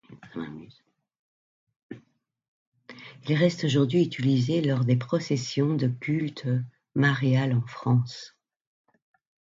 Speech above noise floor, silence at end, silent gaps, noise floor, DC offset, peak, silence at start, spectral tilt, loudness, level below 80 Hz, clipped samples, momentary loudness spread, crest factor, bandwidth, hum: 39 dB; 1.2 s; 1.19-1.67 s, 1.76-1.89 s, 2.48-2.72 s; -64 dBFS; under 0.1%; -10 dBFS; 0.1 s; -7 dB/octave; -26 LUFS; -66 dBFS; under 0.1%; 22 LU; 18 dB; 7.6 kHz; none